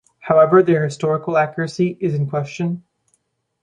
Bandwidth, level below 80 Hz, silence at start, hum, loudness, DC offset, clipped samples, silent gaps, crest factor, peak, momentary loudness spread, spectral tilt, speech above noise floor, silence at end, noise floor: 9.8 kHz; -62 dBFS; 0.25 s; none; -18 LUFS; under 0.1%; under 0.1%; none; 16 dB; -2 dBFS; 12 LU; -7.5 dB/octave; 50 dB; 0.85 s; -67 dBFS